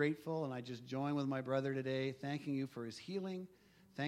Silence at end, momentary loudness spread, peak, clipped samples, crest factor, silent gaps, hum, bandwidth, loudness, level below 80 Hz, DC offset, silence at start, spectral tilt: 0 s; 9 LU; -24 dBFS; under 0.1%; 18 dB; none; none; 14 kHz; -41 LUFS; -82 dBFS; under 0.1%; 0 s; -7 dB/octave